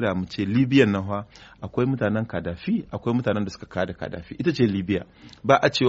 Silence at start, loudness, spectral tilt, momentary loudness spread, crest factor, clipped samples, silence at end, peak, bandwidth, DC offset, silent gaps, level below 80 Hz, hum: 0 s; -24 LUFS; -5.5 dB/octave; 13 LU; 22 dB; under 0.1%; 0 s; -2 dBFS; 8 kHz; under 0.1%; none; -52 dBFS; none